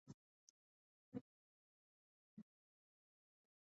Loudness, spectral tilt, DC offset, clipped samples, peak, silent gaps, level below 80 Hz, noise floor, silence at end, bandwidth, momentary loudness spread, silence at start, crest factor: -61 LUFS; -8.5 dB/octave; under 0.1%; under 0.1%; -38 dBFS; 0.14-1.12 s, 1.21-2.37 s; under -90 dBFS; under -90 dBFS; 1.2 s; 6.4 kHz; 11 LU; 0.05 s; 28 dB